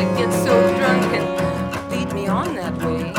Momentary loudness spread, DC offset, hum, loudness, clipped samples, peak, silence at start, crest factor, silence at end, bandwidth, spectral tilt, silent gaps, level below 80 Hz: 9 LU; under 0.1%; none; -20 LUFS; under 0.1%; -4 dBFS; 0 s; 16 dB; 0 s; 17.5 kHz; -6 dB/octave; none; -44 dBFS